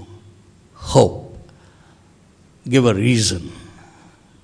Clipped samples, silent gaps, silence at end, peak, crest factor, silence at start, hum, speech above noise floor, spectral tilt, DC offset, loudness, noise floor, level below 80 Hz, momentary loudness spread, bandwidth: under 0.1%; none; 0.8 s; 0 dBFS; 22 dB; 0 s; none; 35 dB; -5 dB/octave; under 0.1%; -17 LUFS; -51 dBFS; -44 dBFS; 21 LU; 10.5 kHz